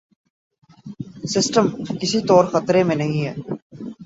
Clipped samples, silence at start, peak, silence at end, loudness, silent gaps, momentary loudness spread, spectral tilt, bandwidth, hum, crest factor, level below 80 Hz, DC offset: under 0.1%; 0.85 s; -2 dBFS; 0 s; -19 LUFS; 3.62-3.70 s; 20 LU; -5 dB/octave; 8 kHz; none; 20 dB; -58 dBFS; under 0.1%